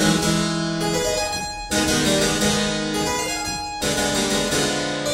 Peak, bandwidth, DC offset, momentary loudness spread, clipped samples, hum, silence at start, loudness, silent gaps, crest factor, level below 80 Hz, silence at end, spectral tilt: -6 dBFS; 16 kHz; under 0.1%; 6 LU; under 0.1%; none; 0 s; -21 LUFS; none; 16 dB; -40 dBFS; 0 s; -3 dB/octave